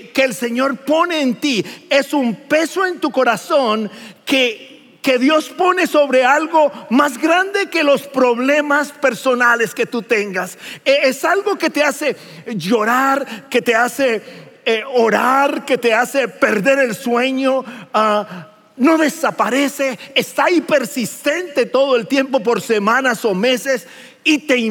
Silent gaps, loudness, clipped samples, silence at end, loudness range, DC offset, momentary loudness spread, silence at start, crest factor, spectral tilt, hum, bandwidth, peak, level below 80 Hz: none; -16 LUFS; under 0.1%; 0 s; 2 LU; under 0.1%; 7 LU; 0 s; 16 dB; -3.5 dB/octave; none; 17 kHz; 0 dBFS; -82 dBFS